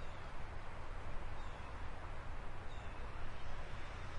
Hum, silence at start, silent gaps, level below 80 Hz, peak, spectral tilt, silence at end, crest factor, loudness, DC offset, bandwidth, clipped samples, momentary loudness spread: none; 0 s; none; -48 dBFS; -30 dBFS; -5.5 dB/octave; 0 s; 12 dB; -50 LUFS; under 0.1%; 8.8 kHz; under 0.1%; 1 LU